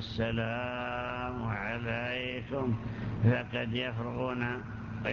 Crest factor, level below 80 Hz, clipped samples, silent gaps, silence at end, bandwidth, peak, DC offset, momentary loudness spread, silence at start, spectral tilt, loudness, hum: 18 dB; -50 dBFS; under 0.1%; none; 0 s; 6.8 kHz; -16 dBFS; under 0.1%; 6 LU; 0 s; -8 dB/octave; -34 LUFS; none